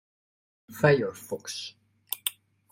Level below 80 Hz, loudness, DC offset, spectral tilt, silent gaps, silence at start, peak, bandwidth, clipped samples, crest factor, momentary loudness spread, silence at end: -66 dBFS; -28 LUFS; under 0.1%; -4.5 dB/octave; none; 0.7 s; -6 dBFS; 16.5 kHz; under 0.1%; 26 dB; 16 LU; 0.4 s